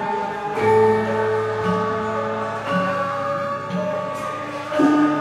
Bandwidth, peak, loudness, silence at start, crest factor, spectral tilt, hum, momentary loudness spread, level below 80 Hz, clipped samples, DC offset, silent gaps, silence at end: 12.5 kHz; -6 dBFS; -21 LUFS; 0 s; 14 dB; -6.5 dB/octave; none; 9 LU; -56 dBFS; under 0.1%; under 0.1%; none; 0 s